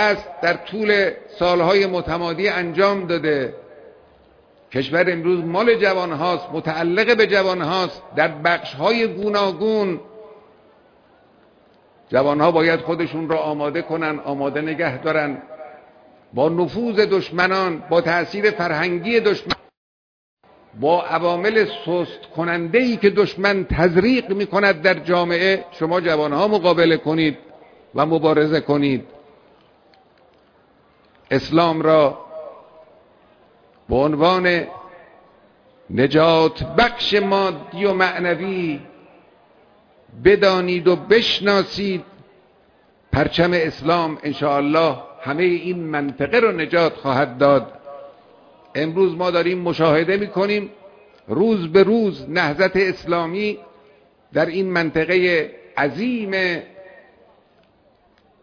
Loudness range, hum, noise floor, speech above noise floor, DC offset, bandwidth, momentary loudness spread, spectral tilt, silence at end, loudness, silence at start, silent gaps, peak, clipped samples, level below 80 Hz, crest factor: 4 LU; none; -57 dBFS; 39 dB; under 0.1%; 5.4 kHz; 9 LU; -6.5 dB/octave; 1.55 s; -19 LUFS; 0 s; 19.77-20.37 s; 0 dBFS; under 0.1%; -48 dBFS; 20 dB